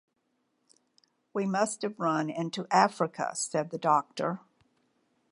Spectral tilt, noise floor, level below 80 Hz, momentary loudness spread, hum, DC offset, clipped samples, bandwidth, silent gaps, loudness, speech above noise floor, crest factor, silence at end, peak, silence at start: -4.5 dB/octave; -77 dBFS; -84 dBFS; 9 LU; none; under 0.1%; under 0.1%; 11.5 kHz; none; -29 LUFS; 48 dB; 24 dB; 0.95 s; -8 dBFS; 1.35 s